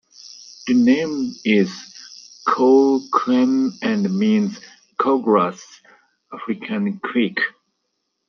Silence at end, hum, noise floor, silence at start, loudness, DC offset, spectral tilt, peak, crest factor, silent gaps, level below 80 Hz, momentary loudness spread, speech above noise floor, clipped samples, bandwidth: 0.8 s; none; -74 dBFS; 0.25 s; -19 LUFS; under 0.1%; -6 dB/octave; -4 dBFS; 16 dB; none; -68 dBFS; 22 LU; 56 dB; under 0.1%; 6.8 kHz